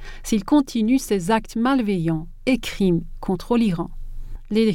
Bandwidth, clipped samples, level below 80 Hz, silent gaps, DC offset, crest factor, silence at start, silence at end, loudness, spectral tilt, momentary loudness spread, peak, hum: 17 kHz; under 0.1%; -36 dBFS; none; under 0.1%; 14 dB; 0 s; 0 s; -22 LUFS; -6 dB/octave; 9 LU; -6 dBFS; none